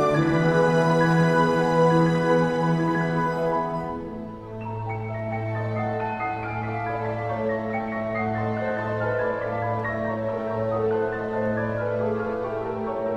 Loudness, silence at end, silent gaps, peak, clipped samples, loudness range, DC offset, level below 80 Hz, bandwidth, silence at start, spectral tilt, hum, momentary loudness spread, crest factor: -24 LUFS; 0 s; none; -8 dBFS; under 0.1%; 8 LU; under 0.1%; -50 dBFS; 10.5 kHz; 0 s; -7.5 dB/octave; none; 10 LU; 16 dB